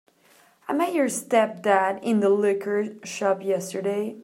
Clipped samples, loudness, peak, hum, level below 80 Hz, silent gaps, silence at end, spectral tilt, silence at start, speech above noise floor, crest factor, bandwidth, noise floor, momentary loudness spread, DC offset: under 0.1%; -24 LUFS; -6 dBFS; none; -80 dBFS; none; 0 s; -4.5 dB/octave; 0.7 s; 35 dB; 18 dB; 16 kHz; -58 dBFS; 7 LU; under 0.1%